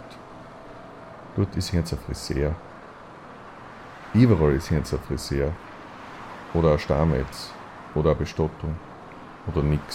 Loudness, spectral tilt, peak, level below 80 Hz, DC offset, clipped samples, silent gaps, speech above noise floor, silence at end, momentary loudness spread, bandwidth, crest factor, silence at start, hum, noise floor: -25 LUFS; -7 dB/octave; -4 dBFS; -36 dBFS; under 0.1%; under 0.1%; none; 20 dB; 0 s; 22 LU; 15.5 kHz; 20 dB; 0 s; none; -43 dBFS